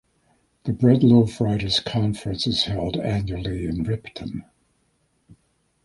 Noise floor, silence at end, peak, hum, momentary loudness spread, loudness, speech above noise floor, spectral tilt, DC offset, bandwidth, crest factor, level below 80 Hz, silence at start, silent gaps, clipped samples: -67 dBFS; 1.45 s; -4 dBFS; none; 17 LU; -22 LUFS; 46 dB; -6.5 dB/octave; under 0.1%; 11.5 kHz; 20 dB; -44 dBFS; 0.65 s; none; under 0.1%